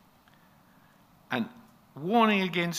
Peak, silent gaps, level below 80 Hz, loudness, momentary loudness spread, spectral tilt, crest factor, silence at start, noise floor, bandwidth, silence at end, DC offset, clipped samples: -8 dBFS; none; -76 dBFS; -28 LUFS; 15 LU; -5 dB/octave; 22 dB; 1.3 s; -60 dBFS; 15.5 kHz; 0 s; under 0.1%; under 0.1%